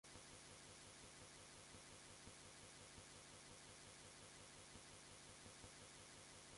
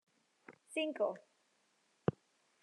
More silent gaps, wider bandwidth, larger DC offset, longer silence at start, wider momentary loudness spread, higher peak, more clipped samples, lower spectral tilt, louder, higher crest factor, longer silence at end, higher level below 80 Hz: neither; about the same, 11.5 kHz vs 11.5 kHz; neither; second, 0.05 s vs 0.5 s; second, 0 LU vs 14 LU; second, -44 dBFS vs -16 dBFS; neither; second, -2 dB/octave vs -6 dB/octave; second, -60 LUFS vs -40 LUFS; second, 18 dB vs 26 dB; second, 0 s vs 0.5 s; about the same, -76 dBFS vs -78 dBFS